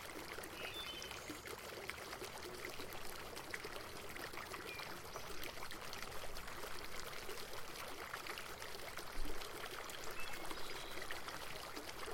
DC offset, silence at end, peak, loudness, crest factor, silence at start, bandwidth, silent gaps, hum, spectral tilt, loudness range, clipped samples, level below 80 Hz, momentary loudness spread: under 0.1%; 0 s; -24 dBFS; -48 LUFS; 20 dB; 0 s; 17 kHz; none; none; -2.5 dB/octave; 1 LU; under 0.1%; -56 dBFS; 2 LU